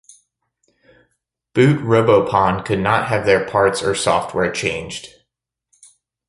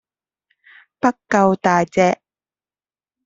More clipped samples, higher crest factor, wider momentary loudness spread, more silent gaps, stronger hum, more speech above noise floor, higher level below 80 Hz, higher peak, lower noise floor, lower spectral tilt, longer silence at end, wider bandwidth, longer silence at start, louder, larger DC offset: neither; about the same, 18 dB vs 20 dB; first, 9 LU vs 6 LU; neither; neither; second, 61 dB vs over 74 dB; first, -48 dBFS vs -60 dBFS; about the same, -2 dBFS vs 0 dBFS; second, -77 dBFS vs under -90 dBFS; about the same, -5.5 dB/octave vs -6 dB/octave; about the same, 1.2 s vs 1.1 s; first, 11.5 kHz vs 7.8 kHz; first, 1.55 s vs 1.05 s; about the same, -17 LUFS vs -18 LUFS; neither